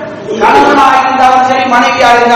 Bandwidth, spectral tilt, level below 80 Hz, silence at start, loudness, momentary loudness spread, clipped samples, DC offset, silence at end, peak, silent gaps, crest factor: 15 kHz; -3.5 dB/octave; -40 dBFS; 0 s; -6 LUFS; 3 LU; 6%; under 0.1%; 0 s; 0 dBFS; none; 6 dB